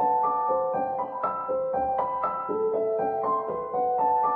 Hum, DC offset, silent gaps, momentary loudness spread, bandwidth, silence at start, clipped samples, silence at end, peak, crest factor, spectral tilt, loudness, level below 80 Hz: none; under 0.1%; none; 5 LU; 3.8 kHz; 0 s; under 0.1%; 0 s; -14 dBFS; 12 dB; -10 dB/octave; -27 LUFS; -62 dBFS